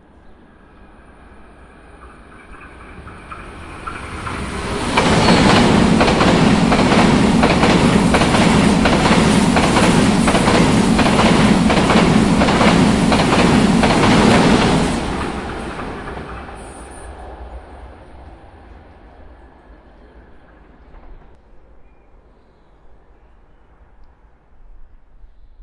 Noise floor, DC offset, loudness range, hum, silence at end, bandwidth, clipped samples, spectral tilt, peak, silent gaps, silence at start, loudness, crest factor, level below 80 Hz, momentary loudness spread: -49 dBFS; under 0.1%; 18 LU; none; 0 s; 11.5 kHz; under 0.1%; -5.5 dB/octave; 0 dBFS; none; 2.05 s; -13 LUFS; 16 dB; -30 dBFS; 22 LU